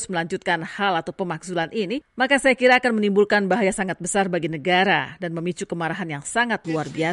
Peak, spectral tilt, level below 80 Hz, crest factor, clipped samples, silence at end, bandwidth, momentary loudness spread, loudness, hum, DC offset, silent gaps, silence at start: -6 dBFS; -4.5 dB/octave; -58 dBFS; 16 dB; under 0.1%; 0 s; 11.5 kHz; 11 LU; -22 LUFS; none; under 0.1%; none; 0 s